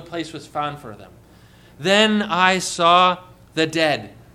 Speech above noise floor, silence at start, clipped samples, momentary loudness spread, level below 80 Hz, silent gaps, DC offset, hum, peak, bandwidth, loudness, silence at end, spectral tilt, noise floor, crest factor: 29 dB; 0 s; under 0.1%; 15 LU; -56 dBFS; none; under 0.1%; none; -2 dBFS; 15 kHz; -18 LUFS; 0.25 s; -3.5 dB/octave; -48 dBFS; 20 dB